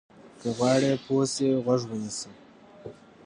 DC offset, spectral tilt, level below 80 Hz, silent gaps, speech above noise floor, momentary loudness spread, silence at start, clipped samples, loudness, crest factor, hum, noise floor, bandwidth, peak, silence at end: under 0.1%; -5 dB/octave; -66 dBFS; none; 20 dB; 22 LU; 0.25 s; under 0.1%; -26 LUFS; 18 dB; none; -46 dBFS; 11 kHz; -10 dBFS; 0.35 s